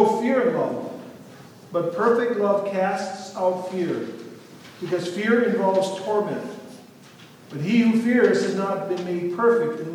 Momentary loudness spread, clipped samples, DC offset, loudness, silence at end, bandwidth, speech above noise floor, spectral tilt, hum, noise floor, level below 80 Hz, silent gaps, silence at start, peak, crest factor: 17 LU; under 0.1%; under 0.1%; -23 LUFS; 0 s; 15 kHz; 25 dB; -6 dB/octave; none; -47 dBFS; -78 dBFS; none; 0 s; -4 dBFS; 18 dB